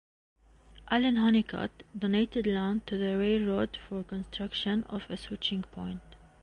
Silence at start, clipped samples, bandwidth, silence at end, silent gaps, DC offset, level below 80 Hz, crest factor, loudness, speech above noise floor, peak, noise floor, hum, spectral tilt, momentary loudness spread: 0.75 s; under 0.1%; 9.6 kHz; 0.25 s; none; under 0.1%; -54 dBFS; 18 dB; -31 LUFS; 26 dB; -14 dBFS; -56 dBFS; none; -7 dB/octave; 13 LU